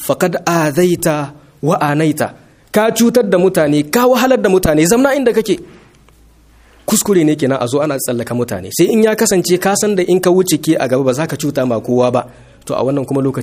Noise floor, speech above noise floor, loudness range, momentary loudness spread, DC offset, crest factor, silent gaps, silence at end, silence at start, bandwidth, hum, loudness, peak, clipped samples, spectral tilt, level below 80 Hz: -46 dBFS; 33 dB; 3 LU; 8 LU; under 0.1%; 14 dB; none; 0 s; 0 s; 15.5 kHz; none; -14 LUFS; 0 dBFS; under 0.1%; -5 dB/octave; -42 dBFS